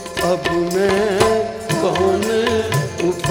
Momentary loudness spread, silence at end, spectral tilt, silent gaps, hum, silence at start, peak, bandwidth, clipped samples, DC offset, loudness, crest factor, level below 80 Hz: 5 LU; 0 s; -5 dB/octave; none; none; 0 s; -2 dBFS; 18.5 kHz; under 0.1%; under 0.1%; -18 LUFS; 16 dB; -42 dBFS